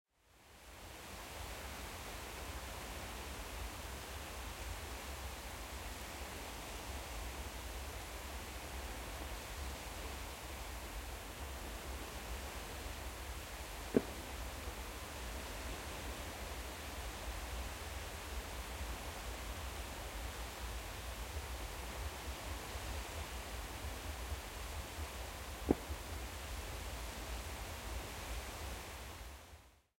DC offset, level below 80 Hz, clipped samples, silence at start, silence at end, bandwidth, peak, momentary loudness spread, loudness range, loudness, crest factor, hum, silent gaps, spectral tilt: under 0.1%; -50 dBFS; under 0.1%; 0.25 s; 0.2 s; 16.5 kHz; -14 dBFS; 2 LU; 3 LU; -45 LUFS; 30 dB; none; none; -4 dB/octave